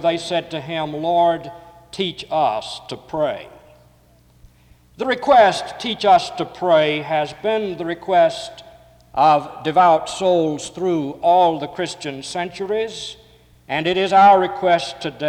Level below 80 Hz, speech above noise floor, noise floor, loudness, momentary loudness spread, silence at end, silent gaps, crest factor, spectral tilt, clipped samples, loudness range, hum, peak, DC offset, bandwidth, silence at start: -56 dBFS; 35 dB; -53 dBFS; -18 LUFS; 14 LU; 0 s; none; 16 dB; -4.5 dB/octave; under 0.1%; 5 LU; none; -4 dBFS; under 0.1%; 11.5 kHz; 0 s